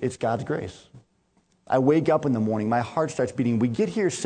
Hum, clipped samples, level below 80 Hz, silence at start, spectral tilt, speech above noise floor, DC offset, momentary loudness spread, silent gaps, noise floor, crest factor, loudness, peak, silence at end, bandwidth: none; under 0.1%; -60 dBFS; 0 s; -6.5 dB/octave; 42 dB; under 0.1%; 7 LU; none; -66 dBFS; 18 dB; -24 LUFS; -8 dBFS; 0 s; 9.4 kHz